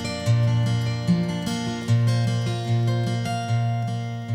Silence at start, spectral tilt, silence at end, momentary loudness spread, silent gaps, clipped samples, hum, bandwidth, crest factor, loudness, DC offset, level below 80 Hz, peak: 0 s; -6.5 dB/octave; 0 s; 6 LU; none; under 0.1%; none; 11 kHz; 12 dB; -24 LUFS; under 0.1%; -52 dBFS; -10 dBFS